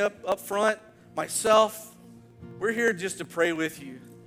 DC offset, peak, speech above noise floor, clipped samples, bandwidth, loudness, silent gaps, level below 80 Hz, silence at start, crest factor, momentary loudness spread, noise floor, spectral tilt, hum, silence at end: under 0.1%; -6 dBFS; 24 dB; under 0.1%; 16.5 kHz; -26 LUFS; none; -66 dBFS; 0 s; 20 dB; 20 LU; -50 dBFS; -3 dB/octave; none; 0.05 s